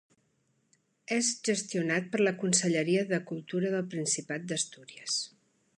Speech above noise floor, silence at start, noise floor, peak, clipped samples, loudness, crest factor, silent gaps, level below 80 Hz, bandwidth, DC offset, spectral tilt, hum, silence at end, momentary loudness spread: 43 dB; 1.1 s; -73 dBFS; -10 dBFS; under 0.1%; -30 LUFS; 22 dB; none; -78 dBFS; 11.5 kHz; under 0.1%; -3.5 dB/octave; none; 0.5 s; 8 LU